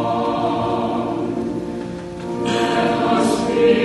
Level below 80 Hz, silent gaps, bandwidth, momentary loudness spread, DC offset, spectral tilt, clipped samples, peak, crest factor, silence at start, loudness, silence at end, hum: -48 dBFS; none; 11.5 kHz; 11 LU; under 0.1%; -5.5 dB/octave; under 0.1%; -2 dBFS; 16 dB; 0 s; -20 LUFS; 0 s; none